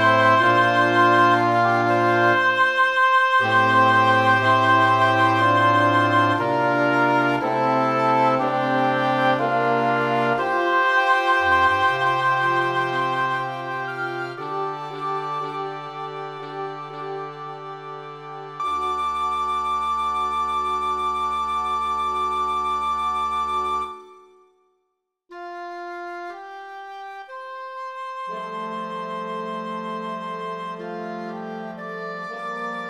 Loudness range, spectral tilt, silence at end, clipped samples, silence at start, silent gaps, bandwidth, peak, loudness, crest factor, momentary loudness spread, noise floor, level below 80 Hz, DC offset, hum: 15 LU; -5.5 dB/octave; 0 s; under 0.1%; 0 s; none; 13 kHz; -4 dBFS; -20 LUFS; 18 dB; 17 LU; -76 dBFS; -56 dBFS; under 0.1%; none